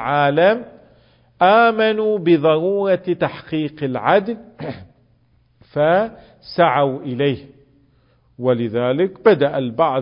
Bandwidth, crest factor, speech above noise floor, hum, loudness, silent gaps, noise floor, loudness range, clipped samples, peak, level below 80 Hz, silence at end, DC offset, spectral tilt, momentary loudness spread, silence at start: 5.4 kHz; 18 dB; 40 dB; none; -17 LUFS; none; -57 dBFS; 5 LU; under 0.1%; 0 dBFS; -56 dBFS; 0 s; under 0.1%; -11.5 dB/octave; 14 LU; 0 s